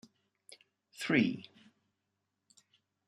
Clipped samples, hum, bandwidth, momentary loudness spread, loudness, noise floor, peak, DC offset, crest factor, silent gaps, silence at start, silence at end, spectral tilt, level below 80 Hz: under 0.1%; none; 13 kHz; 27 LU; -33 LUFS; -85 dBFS; -14 dBFS; under 0.1%; 24 dB; none; 1 s; 1.65 s; -5.5 dB/octave; -80 dBFS